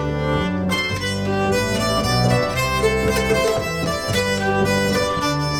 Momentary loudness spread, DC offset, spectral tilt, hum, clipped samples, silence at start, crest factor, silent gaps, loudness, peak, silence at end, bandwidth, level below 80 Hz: 4 LU; under 0.1%; -4.5 dB/octave; none; under 0.1%; 0 s; 14 dB; none; -19 LUFS; -4 dBFS; 0 s; 19.5 kHz; -36 dBFS